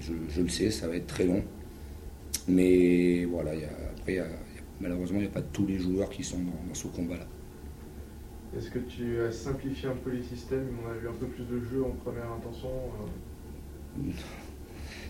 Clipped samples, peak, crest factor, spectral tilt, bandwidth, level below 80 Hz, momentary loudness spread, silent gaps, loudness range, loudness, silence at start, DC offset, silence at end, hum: under 0.1%; -12 dBFS; 20 dB; -6 dB/octave; 16 kHz; -46 dBFS; 18 LU; none; 9 LU; -32 LUFS; 0 s; under 0.1%; 0 s; none